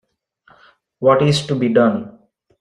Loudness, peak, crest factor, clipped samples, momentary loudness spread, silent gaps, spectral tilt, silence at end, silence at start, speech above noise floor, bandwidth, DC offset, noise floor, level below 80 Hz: -16 LUFS; -2 dBFS; 16 dB; under 0.1%; 10 LU; none; -6.5 dB/octave; 0.5 s; 1 s; 41 dB; 11 kHz; under 0.1%; -56 dBFS; -54 dBFS